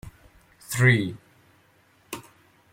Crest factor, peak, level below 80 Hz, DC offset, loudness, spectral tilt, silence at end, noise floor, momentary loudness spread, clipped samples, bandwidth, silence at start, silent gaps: 22 dB; -6 dBFS; -58 dBFS; under 0.1%; -22 LUFS; -5.5 dB/octave; 0.5 s; -61 dBFS; 20 LU; under 0.1%; 16.5 kHz; 0.05 s; none